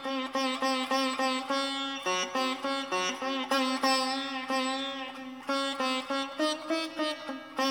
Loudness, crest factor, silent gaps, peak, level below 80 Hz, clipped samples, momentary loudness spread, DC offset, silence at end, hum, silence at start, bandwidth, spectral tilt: -30 LUFS; 16 dB; none; -14 dBFS; -78 dBFS; under 0.1%; 6 LU; under 0.1%; 0 s; none; 0 s; 19 kHz; -1.5 dB/octave